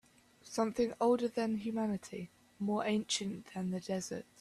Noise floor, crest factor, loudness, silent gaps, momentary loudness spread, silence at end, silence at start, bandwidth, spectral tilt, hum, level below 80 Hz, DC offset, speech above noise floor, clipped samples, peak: -61 dBFS; 16 dB; -36 LUFS; none; 11 LU; 0.15 s; 0.45 s; 13.5 kHz; -4.5 dB/octave; none; -70 dBFS; under 0.1%; 26 dB; under 0.1%; -20 dBFS